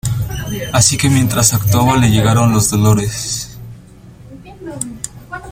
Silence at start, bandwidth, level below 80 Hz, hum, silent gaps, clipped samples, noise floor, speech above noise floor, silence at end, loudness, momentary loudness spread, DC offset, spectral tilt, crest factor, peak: 0.05 s; 16.5 kHz; -34 dBFS; none; none; under 0.1%; -38 dBFS; 26 dB; 0 s; -13 LUFS; 18 LU; under 0.1%; -4.5 dB/octave; 14 dB; 0 dBFS